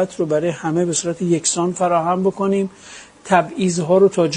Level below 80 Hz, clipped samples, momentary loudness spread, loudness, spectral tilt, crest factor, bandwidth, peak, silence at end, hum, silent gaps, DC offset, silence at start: -58 dBFS; under 0.1%; 8 LU; -18 LUFS; -5 dB/octave; 16 dB; 10.5 kHz; -2 dBFS; 0 s; none; none; under 0.1%; 0 s